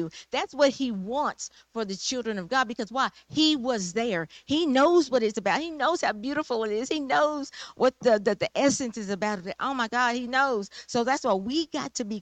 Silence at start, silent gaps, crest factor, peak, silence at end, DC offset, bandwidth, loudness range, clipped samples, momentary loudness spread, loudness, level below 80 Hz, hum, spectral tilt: 0 s; none; 16 dB; -12 dBFS; 0 s; under 0.1%; 9.2 kHz; 3 LU; under 0.1%; 8 LU; -26 LUFS; -64 dBFS; none; -3.5 dB/octave